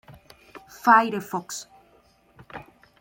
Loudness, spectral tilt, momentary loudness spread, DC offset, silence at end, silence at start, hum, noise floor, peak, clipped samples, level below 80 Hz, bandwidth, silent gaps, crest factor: -21 LUFS; -4 dB/octave; 25 LU; under 0.1%; 0.4 s; 0.1 s; none; -59 dBFS; -4 dBFS; under 0.1%; -66 dBFS; 17 kHz; none; 24 dB